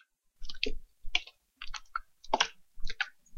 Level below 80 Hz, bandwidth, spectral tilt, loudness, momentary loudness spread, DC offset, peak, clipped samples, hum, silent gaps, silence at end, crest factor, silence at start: -44 dBFS; 7.4 kHz; -1 dB/octave; -35 LUFS; 19 LU; under 0.1%; -8 dBFS; under 0.1%; none; none; 0 s; 28 dB; 0.4 s